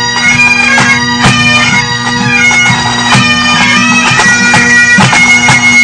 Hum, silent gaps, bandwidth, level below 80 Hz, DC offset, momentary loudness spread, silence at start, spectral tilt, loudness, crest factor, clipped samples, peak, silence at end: none; none; 11 kHz; -34 dBFS; under 0.1%; 4 LU; 0 s; -2.5 dB/octave; -4 LUFS; 6 dB; 2%; 0 dBFS; 0 s